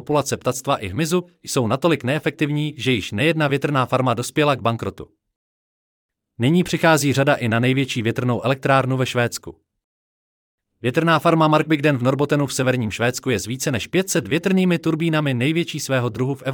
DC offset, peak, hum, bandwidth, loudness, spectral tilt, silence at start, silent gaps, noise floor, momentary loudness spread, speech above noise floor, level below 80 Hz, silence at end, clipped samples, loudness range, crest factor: under 0.1%; -4 dBFS; none; 18.5 kHz; -20 LUFS; -5.5 dB/octave; 0 s; 5.36-6.09 s, 9.84-10.58 s; under -90 dBFS; 7 LU; over 71 dB; -58 dBFS; 0 s; under 0.1%; 3 LU; 16 dB